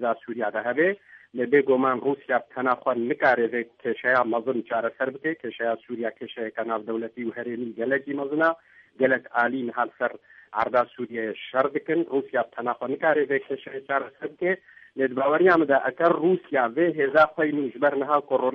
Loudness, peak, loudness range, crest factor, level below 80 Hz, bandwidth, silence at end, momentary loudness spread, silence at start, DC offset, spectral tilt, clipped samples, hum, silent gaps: -25 LUFS; -6 dBFS; 6 LU; 18 dB; -70 dBFS; 6 kHz; 0 s; 11 LU; 0 s; under 0.1%; -8 dB/octave; under 0.1%; none; none